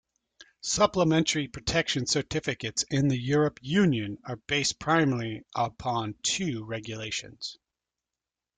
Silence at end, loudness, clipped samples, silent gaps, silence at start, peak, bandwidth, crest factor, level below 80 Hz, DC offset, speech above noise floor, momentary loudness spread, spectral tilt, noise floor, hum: 1.05 s; -27 LUFS; under 0.1%; none; 0.4 s; -8 dBFS; 9.6 kHz; 20 dB; -56 dBFS; under 0.1%; 62 dB; 11 LU; -4 dB/octave; -90 dBFS; none